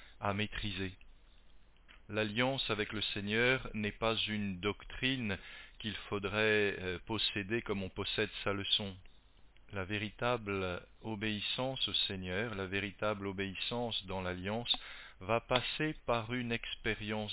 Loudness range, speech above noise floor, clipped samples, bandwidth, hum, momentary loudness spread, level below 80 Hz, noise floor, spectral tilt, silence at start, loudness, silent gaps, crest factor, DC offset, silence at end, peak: 3 LU; 24 dB; under 0.1%; 4 kHz; none; 9 LU; -56 dBFS; -60 dBFS; -2.5 dB/octave; 0 s; -35 LUFS; none; 22 dB; under 0.1%; 0 s; -14 dBFS